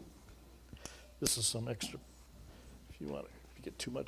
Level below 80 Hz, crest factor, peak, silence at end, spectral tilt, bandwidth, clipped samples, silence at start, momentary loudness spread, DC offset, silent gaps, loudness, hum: -58 dBFS; 28 dB; -14 dBFS; 0 s; -3 dB/octave; 16 kHz; under 0.1%; 0 s; 25 LU; under 0.1%; none; -38 LUFS; none